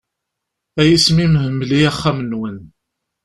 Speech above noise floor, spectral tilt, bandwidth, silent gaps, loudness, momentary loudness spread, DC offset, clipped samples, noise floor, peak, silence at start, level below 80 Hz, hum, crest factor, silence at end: 64 dB; -5.5 dB/octave; 13 kHz; none; -15 LUFS; 16 LU; under 0.1%; under 0.1%; -78 dBFS; -2 dBFS; 0.75 s; -40 dBFS; none; 16 dB; 0.6 s